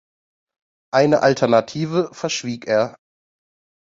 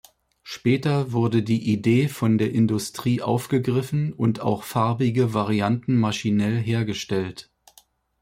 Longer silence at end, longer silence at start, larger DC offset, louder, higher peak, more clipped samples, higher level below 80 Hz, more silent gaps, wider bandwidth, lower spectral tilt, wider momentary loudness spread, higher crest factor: first, 0.95 s vs 0.8 s; first, 0.95 s vs 0.45 s; neither; first, -19 LUFS vs -23 LUFS; first, -2 dBFS vs -8 dBFS; neither; about the same, -62 dBFS vs -58 dBFS; neither; second, 7.8 kHz vs 16 kHz; second, -5 dB/octave vs -7 dB/octave; first, 9 LU vs 5 LU; about the same, 18 dB vs 14 dB